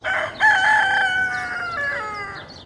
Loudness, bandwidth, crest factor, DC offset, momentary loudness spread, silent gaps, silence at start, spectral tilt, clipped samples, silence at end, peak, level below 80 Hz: -19 LUFS; 11.5 kHz; 16 dB; under 0.1%; 13 LU; none; 0 s; -2 dB/octave; under 0.1%; 0 s; -6 dBFS; -54 dBFS